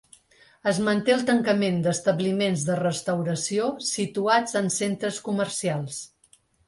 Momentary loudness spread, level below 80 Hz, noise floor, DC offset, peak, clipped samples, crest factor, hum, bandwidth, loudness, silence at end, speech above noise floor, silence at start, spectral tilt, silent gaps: 7 LU; -64 dBFS; -61 dBFS; under 0.1%; -8 dBFS; under 0.1%; 18 dB; none; 11.5 kHz; -25 LUFS; 0.6 s; 37 dB; 0.65 s; -4.5 dB/octave; none